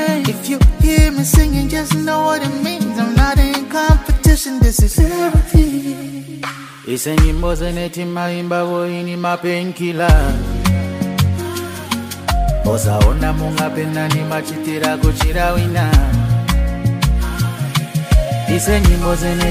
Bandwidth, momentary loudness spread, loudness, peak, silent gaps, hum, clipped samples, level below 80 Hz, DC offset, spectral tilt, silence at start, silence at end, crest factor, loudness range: 16 kHz; 8 LU; -16 LUFS; 0 dBFS; none; none; under 0.1%; -18 dBFS; under 0.1%; -5.5 dB/octave; 0 s; 0 s; 14 dB; 4 LU